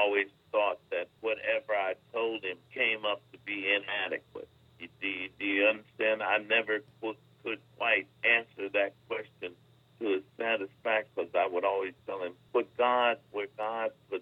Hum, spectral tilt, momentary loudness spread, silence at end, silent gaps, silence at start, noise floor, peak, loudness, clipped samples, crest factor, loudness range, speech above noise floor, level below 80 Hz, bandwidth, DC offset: none; -5.5 dB/octave; 12 LU; 0 s; none; 0 s; -60 dBFS; -12 dBFS; -31 LUFS; under 0.1%; 20 dB; 3 LU; 28 dB; -78 dBFS; 4.8 kHz; under 0.1%